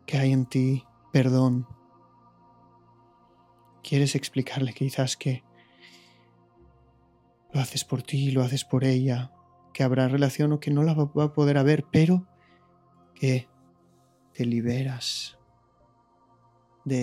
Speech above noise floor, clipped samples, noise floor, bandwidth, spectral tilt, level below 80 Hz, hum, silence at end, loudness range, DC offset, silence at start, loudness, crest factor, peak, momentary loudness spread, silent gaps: 38 dB; under 0.1%; -62 dBFS; 15.5 kHz; -6.5 dB/octave; -66 dBFS; none; 0 s; 9 LU; under 0.1%; 0.1 s; -25 LUFS; 20 dB; -8 dBFS; 10 LU; none